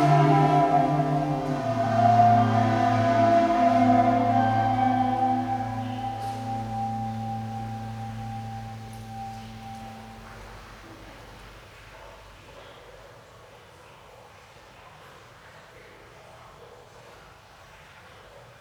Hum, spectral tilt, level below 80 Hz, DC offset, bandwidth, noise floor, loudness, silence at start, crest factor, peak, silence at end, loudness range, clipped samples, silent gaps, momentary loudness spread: none; -7.5 dB/octave; -52 dBFS; under 0.1%; 13 kHz; -50 dBFS; -23 LUFS; 0 s; 18 dB; -8 dBFS; 0.2 s; 25 LU; under 0.1%; none; 26 LU